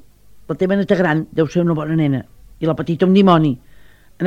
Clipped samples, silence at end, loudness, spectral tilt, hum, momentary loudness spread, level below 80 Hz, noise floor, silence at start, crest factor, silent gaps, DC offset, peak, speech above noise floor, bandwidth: under 0.1%; 0 s; -17 LUFS; -8 dB/octave; none; 11 LU; -48 dBFS; -44 dBFS; 0.35 s; 18 dB; none; under 0.1%; 0 dBFS; 29 dB; 7.4 kHz